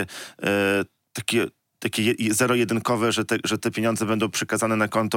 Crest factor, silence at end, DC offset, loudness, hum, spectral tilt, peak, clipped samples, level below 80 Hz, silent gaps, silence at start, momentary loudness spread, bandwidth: 16 dB; 0 s; under 0.1%; -23 LUFS; none; -4 dB/octave; -6 dBFS; under 0.1%; -66 dBFS; none; 0 s; 8 LU; 17 kHz